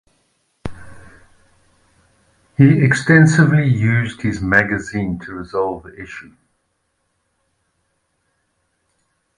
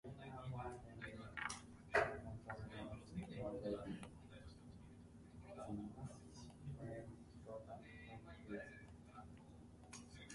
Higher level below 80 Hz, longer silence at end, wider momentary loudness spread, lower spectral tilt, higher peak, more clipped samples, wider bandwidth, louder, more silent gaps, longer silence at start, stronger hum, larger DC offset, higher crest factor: first, -46 dBFS vs -66 dBFS; first, 3.15 s vs 0 s; first, 22 LU vs 14 LU; first, -7 dB/octave vs -5.5 dB/octave; first, 0 dBFS vs -22 dBFS; neither; about the same, 11 kHz vs 11.5 kHz; first, -15 LUFS vs -50 LUFS; neither; first, 0.65 s vs 0.05 s; neither; neither; second, 18 dB vs 28 dB